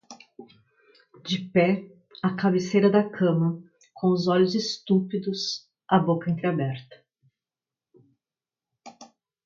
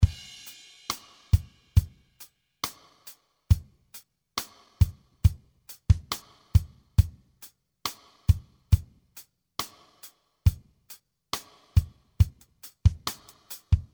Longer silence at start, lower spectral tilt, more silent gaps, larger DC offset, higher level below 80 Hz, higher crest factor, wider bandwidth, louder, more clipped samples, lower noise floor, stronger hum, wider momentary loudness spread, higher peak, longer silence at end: about the same, 0.1 s vs 0 s; first, -6.5 dB/octave vs -5 dB/octave; neither; neither; second, -68 dBFS vs -32 dBFS; about the same, 20 dB vs 22 dB; second, 7.4 kHz vs over 20 kHz; first, -25 LUFS vs -29 LUFS; neither; first, under -90 dBFS vs -54 dBFS; neither; second, 10 LU vs 22 LU; about the same, -8 dBFS vs -6 dBFS; first, 0.4 s vs 0.1 s